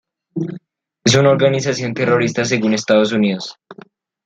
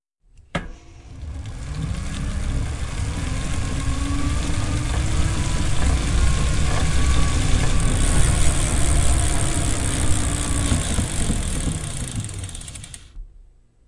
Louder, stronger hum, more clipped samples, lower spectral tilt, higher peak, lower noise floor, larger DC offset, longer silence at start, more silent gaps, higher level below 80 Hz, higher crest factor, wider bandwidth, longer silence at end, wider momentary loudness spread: first, -16 LUFS vs -23 LUFS; neither; neither; about the same, -5 dB/octave vs -4.5 dB/octave; about the same, 0 dBFS vs -2 dBFS; second, -44 dBFS vs -51 dBFS; neither; about the same, 0.35 s vs 0.4 s; neither; second, -58 dBFS vs -24 dBFS; about the same, 16 dB vs 18 dB; second, 9.2 kHz vs 11.5 kHz; about the same, 0.55 s vs 0.45 s; about the same, 14 LU vs 12 LU